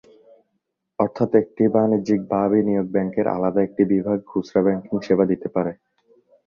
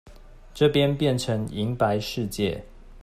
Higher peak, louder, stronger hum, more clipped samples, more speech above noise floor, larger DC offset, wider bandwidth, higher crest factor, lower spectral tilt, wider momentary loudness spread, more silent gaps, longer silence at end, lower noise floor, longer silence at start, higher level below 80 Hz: first, -2 dBFS vs -8 dBFS; first, -21 LUFS vs -25 LUFS; neither; neither; first, 55 dB vs 22 dB; neither; second, 7 kHz vs 15 kHz; about the same, 18 dB vs 18 dB; first, -9 dB/octave vs -6 dB/octave; second, 6 LU vs 9 LU; neither; first, 0.75 s vs 0 s; first, -75 dBFS vs -45 dBFS; first, 1 s vs 0.05 s; second, -58 dBFS vs -46 dBFS